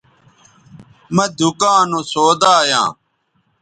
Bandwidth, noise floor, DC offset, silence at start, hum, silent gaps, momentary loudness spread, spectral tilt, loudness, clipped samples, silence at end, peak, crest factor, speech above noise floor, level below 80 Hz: 10.5 kHz; -64 dBFS; under 0.1%; 1.1 s; none; none; 7 LU; -3.5 dB/octave; -14 LUFS; under 0.1%; 0.7 s; 0 dBFS; 16 dB; 50 dB; -60 dBFS